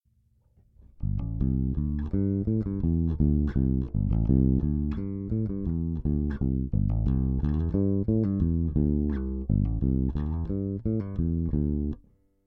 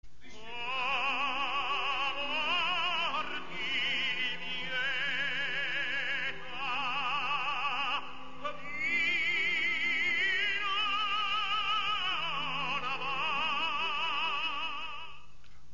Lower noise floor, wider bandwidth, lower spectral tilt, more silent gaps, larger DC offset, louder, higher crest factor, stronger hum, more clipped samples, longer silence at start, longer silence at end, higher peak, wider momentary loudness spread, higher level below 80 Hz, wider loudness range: first, -66 dBFS vs -58 dBFS; second, 3.6 kHz vs 7.2 kHz; first, -13 dB/octave vs 2 dB/octave; neither; second, under 0.1% vs 1%; first, -28 LUFS vs -31 LUFS; about the same, 16 dB vs 12 dB; neither; neither; first, 1 s vs 0 s; first, 0.5 s vs 0.15 s; first, -10 dBFS vs -20 dBFS; about the same, 6 LU vs 8 LU; first, -32 dBFS vs -62 dBFS; about the same, 2 LU vs 3 LU